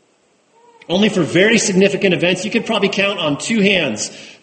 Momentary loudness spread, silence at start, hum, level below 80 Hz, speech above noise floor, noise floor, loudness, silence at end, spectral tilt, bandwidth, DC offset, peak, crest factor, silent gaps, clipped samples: 8 LU; 0.9 s; none; -56 dBFS; 42 dB; -58 dBFS; -15 LUFS; 0.1 s; -4 dB/octave; 8.8 kHz; under 0.1%; 0 dBFS; 16 dB; none; under 0.1%